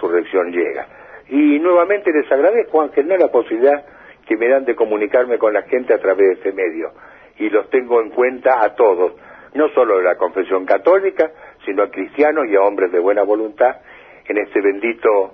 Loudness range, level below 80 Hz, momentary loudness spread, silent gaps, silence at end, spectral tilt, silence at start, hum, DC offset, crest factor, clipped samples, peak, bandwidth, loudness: 2 LU; -62 dBFS; 8 LU; none; 0.05 s; -7.5 dB/octave; 0 s; none; under 0.1%; 14 dB; under 0.1%; -2 dBFS; 4.6 kHz; -16 LUFS